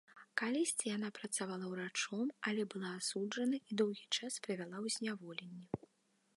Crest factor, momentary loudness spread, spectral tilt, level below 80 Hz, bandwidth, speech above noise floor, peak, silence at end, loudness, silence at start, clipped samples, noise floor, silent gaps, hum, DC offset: 22 dB; 10 LU; -3 dB/octave; -82 dBFS; 11.5 kHz; 37 dB; -18 dBFS; 0.6 s; -40 LUFS; 0.1 s; under 0.1%; -77 dBFS; none; none; under 0.1%